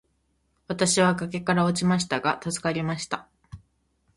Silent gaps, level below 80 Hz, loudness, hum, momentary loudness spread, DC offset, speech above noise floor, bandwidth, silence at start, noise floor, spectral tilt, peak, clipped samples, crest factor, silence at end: none; -58 dBFS; -25 LUFS; none; 11 LU; under 0.1%; 46 dB; 11.5 kHz; 0.7 s; -70 dBFS; -4.5 dB/octave; -6 dBFS; under 0.1%; 20 dB; 0.6 s